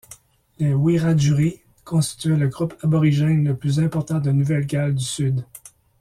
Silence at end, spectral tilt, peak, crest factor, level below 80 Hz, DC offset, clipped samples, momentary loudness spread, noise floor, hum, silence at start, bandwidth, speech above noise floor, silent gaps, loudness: 0.45 s; -6.5 dB/octave; -8 dBFS; 12 dB; -52 dBFS; under 0.1%; under 0.1%; 6 LU; -48 dBFS; none; 0.1 s; 14 kHz; 29 dB; none; -21 LUFS